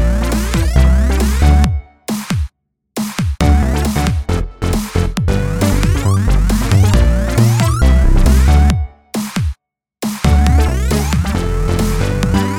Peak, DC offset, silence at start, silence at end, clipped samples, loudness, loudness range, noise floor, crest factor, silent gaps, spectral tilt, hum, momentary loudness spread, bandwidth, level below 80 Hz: 0 dBFS; under 0.1%; 0 s; 0 s; under 0.1%; -15 LUFS; 4 LU; -44 dBFS; 12 dB; none; -6 dB/octave; none; 9 LU; 17 kHz; -16 dBFS